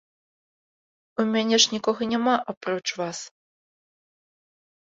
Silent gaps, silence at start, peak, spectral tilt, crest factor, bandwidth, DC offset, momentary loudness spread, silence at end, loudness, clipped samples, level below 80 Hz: 2.57-2.61 s; 1.2 s; -2 dBFS; -2.5 dB/octave; 24 dB; 7.8 kHz; under 0.1%; 14 LU; 1.6 s; -24 LUFS; under 0.1%; -72 dBFS